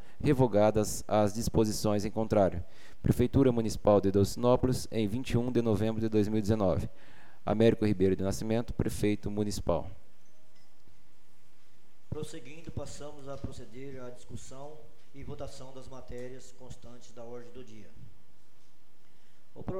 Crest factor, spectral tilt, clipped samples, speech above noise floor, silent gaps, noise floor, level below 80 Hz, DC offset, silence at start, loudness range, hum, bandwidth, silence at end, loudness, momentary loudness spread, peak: 20 dB; -6.5 dB/octave; under 0.1%; 37 dB; none; -67 dBFS; -48 dBFS; 2%; 0.2 s; 19 LU; none; 16.5 kHz; 0 s; -29 LUFS; 22 LU; -10 dBFS